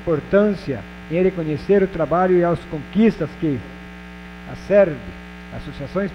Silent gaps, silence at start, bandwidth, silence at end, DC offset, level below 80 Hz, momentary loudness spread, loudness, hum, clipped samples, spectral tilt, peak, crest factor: none; 0 s; 10 kHz; 0 s; under 0.1%; -42 dBFS; 20 LU; -19 LUFS; none; under 0.1%; -8.5 dB/octave; -4 dBFS; 16 dB